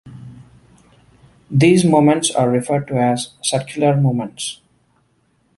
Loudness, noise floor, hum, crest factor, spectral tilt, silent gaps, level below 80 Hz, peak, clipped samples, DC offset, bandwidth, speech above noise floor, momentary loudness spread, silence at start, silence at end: -17 LUFS; -61 dBFS; none; 18 dB; -5.5 dB/octave; none; -54 dBFS; 0 dBFS; under 0.1%; under 0.1%; 11.5 kHz; 45 dB; 15 LU; 0.05 s; 1.05 s